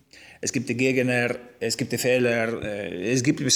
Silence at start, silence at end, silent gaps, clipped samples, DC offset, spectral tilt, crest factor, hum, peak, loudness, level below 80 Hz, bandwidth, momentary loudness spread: 0.2 s; 0 s; none; under 0.1%; under 0.1%; -4 dB/octave; 16 dB; none; -8 dBFS; -24 LUFS; -60 dBFS; 20 kHz; 9 LU